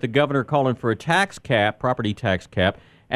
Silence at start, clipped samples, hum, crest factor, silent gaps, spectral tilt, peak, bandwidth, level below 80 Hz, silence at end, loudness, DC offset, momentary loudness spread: 0.05 s; under 0.1%; none; 20 dB; none; -6 dB/octave; -2 dBFS; 13.5 kHz; -46 dBFS; 0 s; -22 LUFS; under 0.1%; 4 LU